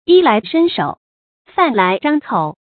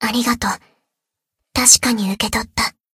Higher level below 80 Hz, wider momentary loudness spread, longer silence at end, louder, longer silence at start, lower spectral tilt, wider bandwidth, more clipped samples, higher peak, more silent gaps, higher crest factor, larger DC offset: second, -60 dBFS vs -42 dBFS; second, 10 LU vs 13 LU; about the same, 0.25 s vs 0.25 s; about the same, -15 LUFS vs -15 LUFS; about the same, 0.1 s vs 0 s; first, -11 dB/octave vs -1.5 dB/octave; second, 4.6 kHz vs 17 kHz; neither; about the same, 0 dBFS vs 0 dBFS; first, 0.97-1.45 s vs none; second, 14 dB vs 20 dB; neither